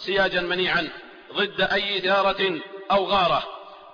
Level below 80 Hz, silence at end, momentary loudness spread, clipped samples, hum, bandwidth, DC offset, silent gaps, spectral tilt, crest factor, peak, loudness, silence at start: -52 dBFS; 0 s; 13 LU; under 0.1%; none; 5.4 kHz; under 0.1%; none; -5 dB/octave; 14 dB; -10 dBFS; -23 LUFS; 0 s